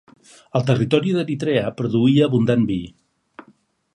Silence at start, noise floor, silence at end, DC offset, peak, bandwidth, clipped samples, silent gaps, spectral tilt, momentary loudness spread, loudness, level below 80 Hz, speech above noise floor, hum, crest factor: 0.55 s; -57 dBFS; 0.55 s; under 0.1%; -2 dBFS; 10.5 kHz; under 0.1%; none; -7.5 dB/octave; 8 LU; -19 LUFS; -54 dBFS; 39 dB; none; 18 dB